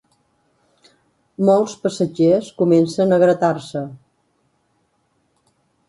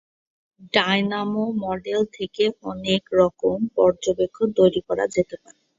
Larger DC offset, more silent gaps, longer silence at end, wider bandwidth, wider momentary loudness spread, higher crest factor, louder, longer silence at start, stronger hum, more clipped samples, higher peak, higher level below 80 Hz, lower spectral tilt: neither; neither; first, 1.95 s vs 0.45 s; first, 11.5 kHz vs 7.8 kHz; first, 14 LU vs 7 LU; about the same, 16 dB vs 20 dB; first, -17 LUFS vs -22 LUFS; first, 1.4 s vs 0.6 s; neither; neither; about the same, -4 dBFS vs -2 dBFS; second, -64 dBFS vs -56 dBFS; first, -7 dB/octave vs -5.5 dB/octave